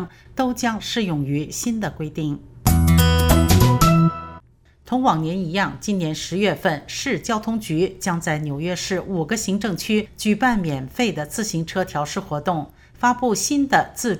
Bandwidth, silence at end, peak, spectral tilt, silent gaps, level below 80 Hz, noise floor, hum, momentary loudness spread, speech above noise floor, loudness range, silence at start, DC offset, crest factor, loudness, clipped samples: 18.5 kHz; 0 s; -2 dBFS; -5 dB/octave; none; -32 dBFS; -51 dBFS; none; 10 LU; 29 dB; 5 LU; 0 s; under 0.1%; 20 dB; -21 LUFS; under 0.1%